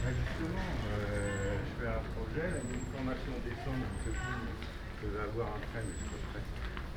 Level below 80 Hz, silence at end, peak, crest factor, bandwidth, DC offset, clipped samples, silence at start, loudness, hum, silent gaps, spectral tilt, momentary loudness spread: -42 dBFS; 0 s; -24 dBFS; 14 dB; 16.5 kHz; under 0.1%; under 0.1%; 0 s; -38 LUFS; none; none; -6 dB/octave; 6 LU